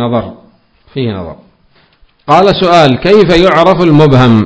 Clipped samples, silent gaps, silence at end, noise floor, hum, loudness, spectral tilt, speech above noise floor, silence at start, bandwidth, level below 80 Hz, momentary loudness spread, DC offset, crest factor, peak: 5%; none; 0 s; -49 dBFS; none; -7 LUFS; -7 dB/octave; 42 dB; 0 s; 8 kHz; -34 dBFS; 19 LU; under 0.1%; 8 dB; 0 dBFS